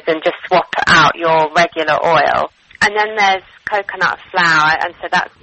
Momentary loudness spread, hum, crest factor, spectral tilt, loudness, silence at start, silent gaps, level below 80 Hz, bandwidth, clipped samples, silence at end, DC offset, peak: 8 LU; none; 14 dB; -3.5 dB/octave; -14 LUFS; 0.05 s; none; -48 dBFS; 8.6 kHz; under 0.1%; 0.15 s; under 0.1%; 0 dBFS